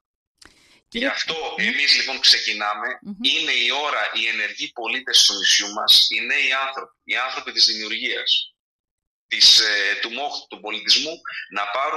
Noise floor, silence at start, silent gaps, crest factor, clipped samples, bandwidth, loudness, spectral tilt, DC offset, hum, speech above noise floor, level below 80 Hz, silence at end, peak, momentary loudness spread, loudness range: -52 dBFS; 0.9 s; 8.59-8.84 s, 8.91-8.98 s, 9.07-9.29 s; 20 dB; under 0.1%; 15 kHz; -18 LUFS; 1 dB/octave; under 0.1%; none; 31 dB; -64 dBFS; 0 s; -2 dBFS; 15 LU; 3 LU